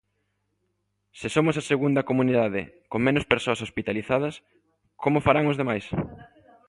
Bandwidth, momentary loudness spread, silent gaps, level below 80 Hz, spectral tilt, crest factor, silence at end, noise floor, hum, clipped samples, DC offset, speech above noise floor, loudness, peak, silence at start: 11.5 kHz; 10 LU; none; -52 dBFS; -6.5 dB/octave; 26 dB; 0.45 s; -75 dBFS; 50 Hz at -60 dBFS; under 0.1%; under 0.1%; 51 dB; -25 LUFS; 0 dBFS; 1.15 s